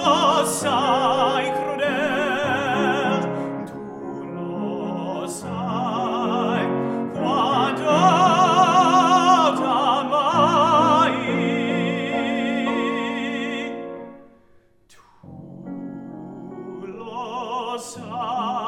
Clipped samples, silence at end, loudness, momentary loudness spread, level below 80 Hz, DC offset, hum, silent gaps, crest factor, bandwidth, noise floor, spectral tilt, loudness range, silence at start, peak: under 0.1%; 0 s; -20 LUFS; 18 LU; -62 dBFS; under 0.1%; none; none; 18 dB; 15.5 kHz; -55 dBFS; -4.5 dB/octave; 16 LU; 0 s; -4 dBFS